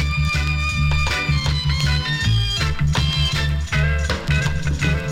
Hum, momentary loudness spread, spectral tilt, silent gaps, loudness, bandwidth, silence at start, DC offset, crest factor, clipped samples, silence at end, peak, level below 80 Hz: none; 2 LU; -4.5 dB/octave; none; -20 LUFS; 13.5 kHz; 0 s; under 0.1%; 14 dB; under 0.1%; 0 s; -6 dBFS; -24 dBFS